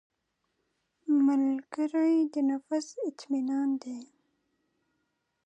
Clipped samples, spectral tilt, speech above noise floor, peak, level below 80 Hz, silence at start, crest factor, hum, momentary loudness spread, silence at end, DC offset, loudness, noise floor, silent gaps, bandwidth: under 0.1%; -4.5 dB/octave; 51 dB; -18 dBFS; -88 dBFS; 1.05 s; 14 dB; none; 12 LU; 1.4 s; under 0.1%; -29 LUFS; -80 dBFS; none; 8.8 kHz